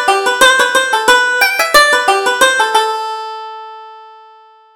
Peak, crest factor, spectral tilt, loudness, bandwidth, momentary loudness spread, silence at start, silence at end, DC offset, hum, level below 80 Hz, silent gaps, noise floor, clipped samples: 0 dBFS; 12 dB; 0.5 dB/octave; -10 LUFS; over 20 kHz; 18 LU; 0 s; 0.65 s; under 0.1%; none; -48 dBFS; none; -42 dBFS; under 0.1%